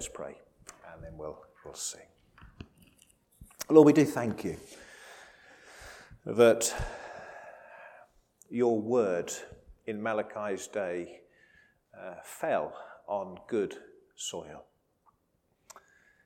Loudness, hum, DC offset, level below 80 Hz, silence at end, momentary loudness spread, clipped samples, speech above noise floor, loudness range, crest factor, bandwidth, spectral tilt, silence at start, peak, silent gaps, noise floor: -29 LUFS; none; under 0.1%; -58 dBFS; 1.65 s; 27 LU; under 0.1%; 45 dB; 11 LU; 26 dB; 18 kHz; -5 dB/octave; 0 s; -6 dBFS; none; -74 dBFS